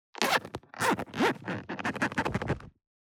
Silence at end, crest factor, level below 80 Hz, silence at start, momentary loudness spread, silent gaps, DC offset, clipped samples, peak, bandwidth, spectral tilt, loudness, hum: 0.35 s; 24 dB; -56 dBFS; 0.2 s; 9 LU; none; under 0.1%; under 0.1%; -8 dBFS; over 20 kHz; -4 dB/octave; -31 LUFS; none